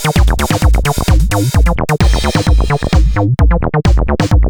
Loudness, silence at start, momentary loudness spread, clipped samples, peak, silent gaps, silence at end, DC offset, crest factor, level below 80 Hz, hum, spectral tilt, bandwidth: -13 LUFS; 0 s; 1 LU; under 0.1%; 0 dBFS; none; 0 s; under 0.1%; 10 dB; -12 dBFS; none; -6 dB/octave; 18.5 kHz